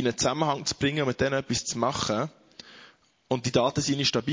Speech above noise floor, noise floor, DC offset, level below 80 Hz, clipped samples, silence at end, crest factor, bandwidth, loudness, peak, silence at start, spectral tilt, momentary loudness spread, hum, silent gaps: 29 dB; -56 dBFS; under 0.1%; -54 dBFS; under 0.1%; 0 s; 18 dB; 7.8 kHz; -27 LUFS; -8 dBFS; 0 s; -4 dB/octave; 7 LU; none; none